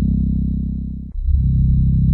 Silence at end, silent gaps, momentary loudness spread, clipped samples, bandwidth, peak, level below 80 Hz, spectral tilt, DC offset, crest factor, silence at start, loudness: 0 s; none; 10 LU; under 0.1%; 0.7 kHz; -6 dBFS; -20 dBFS; -14 dB/octave; under 0.1%; 12 dB; 0 s; -19 LUFS